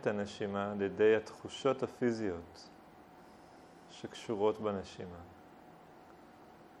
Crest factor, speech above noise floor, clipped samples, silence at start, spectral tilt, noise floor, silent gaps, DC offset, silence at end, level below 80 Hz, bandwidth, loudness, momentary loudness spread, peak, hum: 20 dB; 22 dB; under 0.1%; 0 s; -6 dB/octave; -57 dBFS; none; under 0.1%; 0 s; -70 dBFS; 10.5 kHz; -35 LUFS; 26 LU; -18 dBFS; none